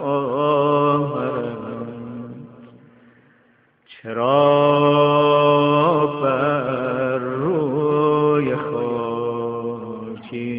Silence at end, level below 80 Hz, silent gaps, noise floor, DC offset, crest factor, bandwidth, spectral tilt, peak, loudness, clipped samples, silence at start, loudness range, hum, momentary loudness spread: 0 s; -62 dBFS; none; -58 dBFS; under 0.1%; 16 dB; 5 kHz; -11.5 dB/octave; -4 dBFS; -19 LUFS; under 0.1%; 0 s; 8 LU; none; 16 LU